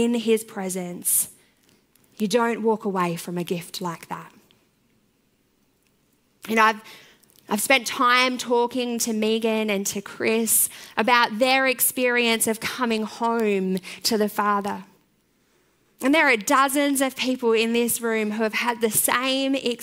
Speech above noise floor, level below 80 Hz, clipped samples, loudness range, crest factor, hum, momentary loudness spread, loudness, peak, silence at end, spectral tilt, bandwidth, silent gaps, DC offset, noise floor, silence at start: 43 dB; -70 dBFS; under 0.1%; 8 LU; 22 dB; none; 11 LU; -22 LUFS; -2 dBFS; 0 s; -2.5 dB/octave; 16 kHz; none; under 0.1%; -66 dBFS; 0 s